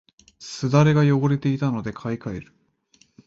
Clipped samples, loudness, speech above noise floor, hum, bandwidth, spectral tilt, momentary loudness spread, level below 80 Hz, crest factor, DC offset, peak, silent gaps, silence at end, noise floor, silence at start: under 0.1%; -21 LUFS; 40 dB; none; 7.8 kHz; -7.5 dB/octave; 19 LU; -54 dBFS; 18 dB; under 0.1%; -4 dBFS; none; 0.85 s; -61 dBFS; 0.4 s